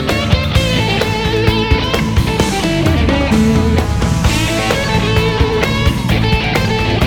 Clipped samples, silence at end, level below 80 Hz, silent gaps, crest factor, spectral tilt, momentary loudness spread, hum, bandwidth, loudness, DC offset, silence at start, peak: under 0.1%; 0 s; -20 dBFS; none; 12 dB; -5.5 dB/octave; 2 LU; none; 19 kHz; -14 LUFS; under 0.1%; 0 s; 0 dBFS